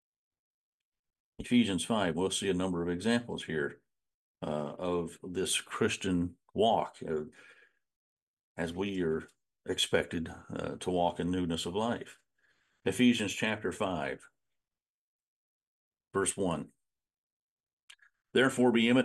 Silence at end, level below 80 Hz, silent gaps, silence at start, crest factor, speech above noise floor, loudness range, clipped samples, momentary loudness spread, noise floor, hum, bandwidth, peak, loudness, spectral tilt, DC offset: 0 s; -66 dBFS; 4.14-4.35 s, 7.96-8.37 s, 8.43-8.55 s, 14.82-15.91 s, 17.18-17.64 s, 17.73-17.77 s, 17.83-17.88 s; 1.4 s; 20 dB; over 59 dB; 5 LU; under 0.1%; 12 LU; under -90 dBFS; none; 12.5 kHz; -14 dBFS; -32 LUFS; -4.5 dB/octave; under 0.1%